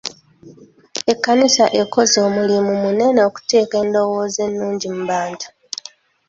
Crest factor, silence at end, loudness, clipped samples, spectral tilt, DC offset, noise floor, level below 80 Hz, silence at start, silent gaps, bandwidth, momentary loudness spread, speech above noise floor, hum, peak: 16 dB; 0.8 s; -16 LUFS; under 0.1%; -3.5 dB/octave; under 0.1%; -41 dBFS; -60 dBFS; 0.05 s; none; 7.8 kHz; 16 LU; 24 dB; none; -2 dBFS